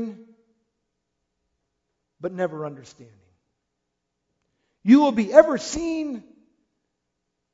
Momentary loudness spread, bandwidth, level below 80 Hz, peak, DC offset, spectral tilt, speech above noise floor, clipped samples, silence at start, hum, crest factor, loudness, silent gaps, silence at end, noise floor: 19 LU; 7.8 kHz; -58 dBFS; 0 dBFS; under 0.1%; -5.5 dB/octave; 59 dB; under 0.1%; 0 s; none; 24 dB; -20 LUFS; none; 1.35 s; -79 dBFS